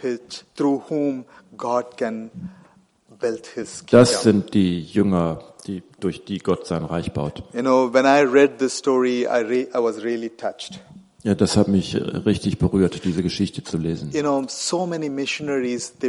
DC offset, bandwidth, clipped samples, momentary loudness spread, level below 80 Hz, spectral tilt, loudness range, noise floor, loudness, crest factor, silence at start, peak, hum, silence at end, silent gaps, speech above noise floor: under 0.1%; 11.5 kHz; under 0.1%; 15 LU; -48 dBFS; -5.5 dB/octave; 5 LU; -54 dBFS; -21 LUFS; 20 dB; 0 s; -2 dBFS; none; 0 s; none; 34 dB